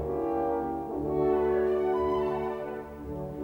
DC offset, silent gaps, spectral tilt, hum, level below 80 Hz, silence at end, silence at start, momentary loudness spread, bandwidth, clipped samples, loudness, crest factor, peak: under 0.1%; none; -8.5 dB/octave; none; -50 dBFS; 0 s; 0 s; 12 LU; 5.4 kHz; under 0.1%; -29 LUFS; 14 dB; -16 dBFS